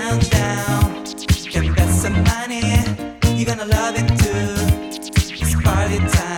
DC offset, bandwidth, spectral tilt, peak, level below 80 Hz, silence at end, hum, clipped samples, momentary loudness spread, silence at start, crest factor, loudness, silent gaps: under 0.1%; 19 kHz; -5 dB/octave; -2 dBFS; -26 dBFS; 0 s; none; under 0.1%; 4 LU; 0 s; 16 dB; -18 LUFS; none